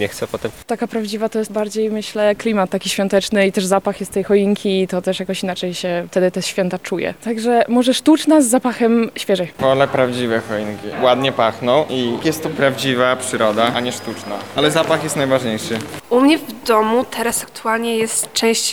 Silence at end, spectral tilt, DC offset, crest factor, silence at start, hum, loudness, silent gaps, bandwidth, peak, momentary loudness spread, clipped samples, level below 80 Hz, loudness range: 0 s; -4 dB/octave; 0.2%; 16 dB; 0 s; none; -17 LUFS; none; 18.5 kHz; -2 dBFS; 8 LU; under 0.1%; -54 dBFS; 3 LU